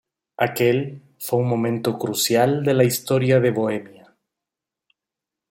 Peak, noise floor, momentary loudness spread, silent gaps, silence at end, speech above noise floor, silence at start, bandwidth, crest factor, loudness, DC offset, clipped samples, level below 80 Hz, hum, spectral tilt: -4 dBFS; -86 dBFS; 7 LU; none; 1.65 s; 67 dB; 0.4 s; 16.5 kHz; 18 dB; -20 LUFS; under 0.1%; under 0.1%; -62 dBFS; none; -5 dB/octave